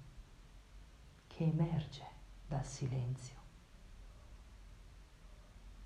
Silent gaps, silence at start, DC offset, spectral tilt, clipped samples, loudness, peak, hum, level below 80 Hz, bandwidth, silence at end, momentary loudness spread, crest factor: none; 0 s; under 0.1%; -7 dB/octave; under 0.1%; -40 LUFS; -24 dBFS; none; -56 dBFS; 10.5 kHz; 0 s; 24 LU; 20 dB